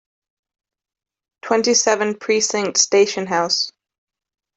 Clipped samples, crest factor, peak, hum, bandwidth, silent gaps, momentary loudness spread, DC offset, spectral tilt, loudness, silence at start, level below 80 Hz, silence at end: under 0.1%; 18 dB; -2 dBFS; none; 8.4 kHz; none; 6 LU; under 0.1%; -1.5 dB/octave; -17 LUFS; 1.45 s; -68 dBFS; 0.9 s